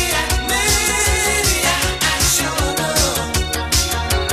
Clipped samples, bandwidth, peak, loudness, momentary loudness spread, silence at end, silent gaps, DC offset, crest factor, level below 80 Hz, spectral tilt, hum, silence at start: under 0.1%; 16 kHz; -4 dBFS; -16 LUFS; 4 LU; 0 s; none; under 0.1%; 14 dB; -26 dBFS; -2 dB/octave; none; 0 s